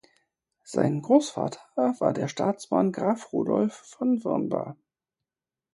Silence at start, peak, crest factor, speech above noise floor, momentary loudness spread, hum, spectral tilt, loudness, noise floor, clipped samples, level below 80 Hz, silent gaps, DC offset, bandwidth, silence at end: 0.7 s; -6 dBFS; 20 dB; over 64 dB; 9 LU; none; -6.5 dB/octave; -26 LUFS; under -90 dBFS; under 0.1%; -72 dBFS; none; under 0.1%; 11.5 kHz; 1 s